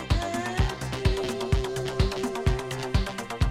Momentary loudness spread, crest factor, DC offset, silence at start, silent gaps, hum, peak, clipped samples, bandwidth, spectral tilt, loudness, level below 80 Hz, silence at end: 2 LU; 16 dB; under 0.1%; 0 s; none; none; -10 dBFS; under 0.1%; 15.5 kHz; -5.5 dB/octave; -28 LUFS; -32 dBFS; 0 s